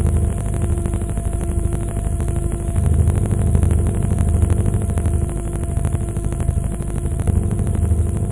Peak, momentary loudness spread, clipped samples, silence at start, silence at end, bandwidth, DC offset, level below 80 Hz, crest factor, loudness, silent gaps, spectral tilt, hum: -2 dBFS; 6 LU; under 0.1%; 0 s; 0 s; 11.5 kHz; under 0.1%; -22 dBFS; 16 dB; -20 LUFS; none; -7.5 dB/octave; none